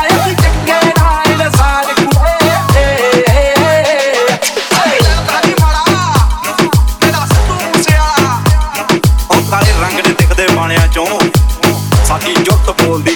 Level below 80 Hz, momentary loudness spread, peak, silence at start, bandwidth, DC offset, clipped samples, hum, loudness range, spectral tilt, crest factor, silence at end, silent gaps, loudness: -16 dBFS; 3 LU; 0 dBFS; 0 s; over 20 kHz; under 0.1%; under 0.1%; none; 1 LU; -4.5 dB/octave; 10 dB; 0 s; none; -10 LUFS